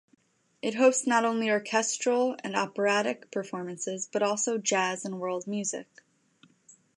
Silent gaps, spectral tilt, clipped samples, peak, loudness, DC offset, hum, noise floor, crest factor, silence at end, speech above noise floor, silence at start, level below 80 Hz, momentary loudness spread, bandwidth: none; -3 dB/octave; under 0.1%; -10 dBFS; -28 LUFS; under 0.1%; none; -63 dBFS; 20 dB; 1.15 s; 35 dB; 0.65 s; -84 dBFS; 10 LU; 11.5 kHz